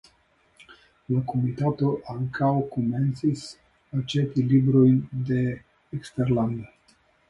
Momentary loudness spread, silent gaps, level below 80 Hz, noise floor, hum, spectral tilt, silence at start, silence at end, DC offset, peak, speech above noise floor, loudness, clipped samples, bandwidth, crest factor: 15 LU; none; -56 dBFS; -64 dBFS; none; -8.5 dB/octave; 0.7 s; 0.65 s; under 0.1%; -8 dBFS; 40 dB; -25 LUFS; under 0.1%; 11 kHz; 16 dB